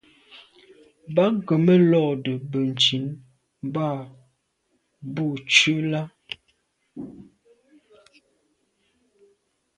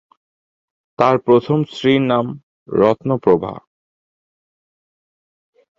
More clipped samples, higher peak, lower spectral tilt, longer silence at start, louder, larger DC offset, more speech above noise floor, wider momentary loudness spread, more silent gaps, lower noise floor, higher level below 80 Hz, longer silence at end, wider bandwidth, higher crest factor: neither; about the same, -2 dBFS vs 0 dBFS; second, -5 dB/octave vs -8 dB/octave; second, 0.35 s vs 1 s; second, -21 LUFS vs -16 LUFS; neither; second, 50 dB vs over 75 dB; first, 23 LU vs 13 LU; second, none vs 2.43-2.66 s; second, -72 dBFS vs under -90 dBFS; second, -68 dBFS vs -56 dBFS; first, 2.55 s vs 2.2 s; first, 10 kHz vs 7.6 kHz; first, 24 dB vs 18 dB